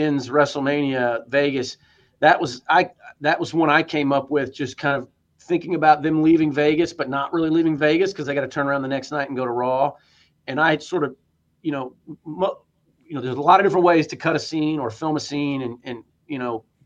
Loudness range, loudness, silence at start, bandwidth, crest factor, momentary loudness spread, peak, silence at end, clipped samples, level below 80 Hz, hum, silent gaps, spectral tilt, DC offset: 5 LU; -21 LUFS; 0 s; 7.8 kHz; 20 dB; 12 LU; -2 dBFS; 0.25 s; under 0.1%; -62 dBFS; none; none; -6 dB/octave; under 0.1%